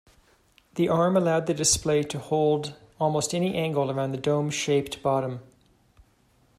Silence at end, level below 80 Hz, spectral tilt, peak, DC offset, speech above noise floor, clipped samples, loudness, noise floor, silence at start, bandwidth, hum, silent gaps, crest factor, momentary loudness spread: 1.15 s; -56 dBFS; -4.5 dB/octave; -8 dBFS; under 0.1%; 38 dB; under 0.1%; -25 LUFS; -63 dBFS; 0.75 s; 15 kHz; none; none; 18 dB; 7 LU